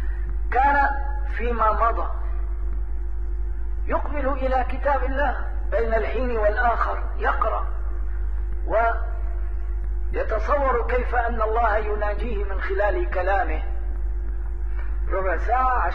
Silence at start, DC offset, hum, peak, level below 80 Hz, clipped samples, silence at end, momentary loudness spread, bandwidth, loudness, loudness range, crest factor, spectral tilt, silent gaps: 0 s; 3%; none; -8 dBFS; -26 dBFS; under 0.1%; 0 s; 9 LU; 4.6 kHz; -25 LUFS; 3 LU; 16 dB; -8.5 dB/octave; none